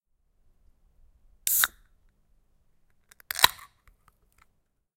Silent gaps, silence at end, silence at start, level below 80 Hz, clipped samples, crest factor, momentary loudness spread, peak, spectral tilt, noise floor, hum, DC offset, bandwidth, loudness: none; 1.3 s; 1.45 s; -62 dBFS; under 0.1%; 34 dB; 10 LU; 0 dBFS; 1.5 dB/octave; -72 dBFS; none; under 0.1%; 17 kHz; -24 LUFS